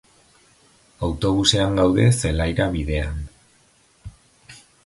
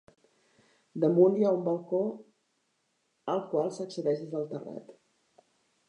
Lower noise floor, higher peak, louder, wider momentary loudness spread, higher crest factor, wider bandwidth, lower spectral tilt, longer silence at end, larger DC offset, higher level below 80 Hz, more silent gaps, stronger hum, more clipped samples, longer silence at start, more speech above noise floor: second, -58 dBFS vs -76 dBFS; first, -2 dBFS vs -10 dBFS; first, -20 LUFS vs -29 LUFS; second, 12 LU vs 20 LU; about the same, 22 dB vs 22 dB; first, 11.5 kHz vs 10 kHz; second, -5 dB/octave vs -8 dB/octave; second, 0.3 s vs 0.95 s; neither; first, -34 dBFS vs -86 dBFS; neither; neither; neither; about the same, 1 s vs 0.95 s; second, 38 dB vs 48 dB